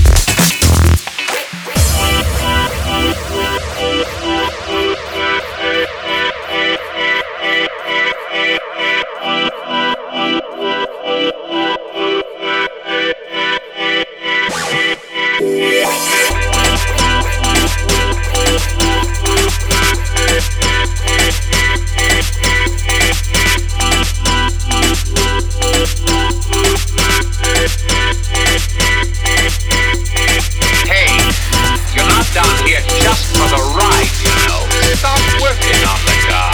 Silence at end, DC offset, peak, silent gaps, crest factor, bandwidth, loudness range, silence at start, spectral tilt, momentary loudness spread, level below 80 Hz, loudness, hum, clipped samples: 0 s; under 0.1%; 0 dBFS; none; 14 dB; over 20 kHz; 5 LU; 0 s; -3 dB/octave; 6 LU; -18 dBFS; -13 LUFS; none; under 0.1%